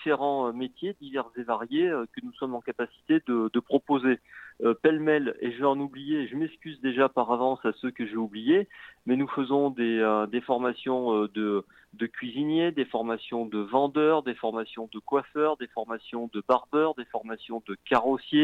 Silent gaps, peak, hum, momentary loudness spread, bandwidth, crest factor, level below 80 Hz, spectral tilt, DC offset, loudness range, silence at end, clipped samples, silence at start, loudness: none; -8 dBFS; none; 10 LU; 5 kHz; 18 dB; -72 dBFS; -7.5 dB/octave; under 0.1%; 3 LU; 0 s; under 0.1%; 0 s; -28 LUFS